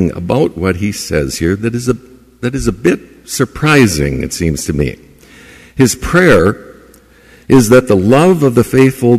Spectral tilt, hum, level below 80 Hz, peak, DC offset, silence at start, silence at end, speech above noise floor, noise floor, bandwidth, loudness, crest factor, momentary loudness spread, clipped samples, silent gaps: -5.5 dB/octave; none; -32 dBFS; 0 dBFS; under 0.1%; 0 s; 0 s; 32 dB; -43 dBFS; 15.5 kHz; -12 LUFS; 12 dB; 11 LU; under 0.1%; none